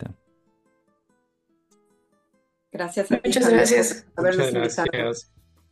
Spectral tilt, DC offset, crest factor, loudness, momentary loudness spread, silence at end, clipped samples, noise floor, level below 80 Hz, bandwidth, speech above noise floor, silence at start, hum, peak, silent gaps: -4 dB/octave; under 0.1%; 20 dB; -21 LUFS; 16 LU; 0.5 s; under 0.1%; -70 dBFS; -58 dBFS; 12.5 kHz; 48 dB; 0 s; none; -4 dBFS; none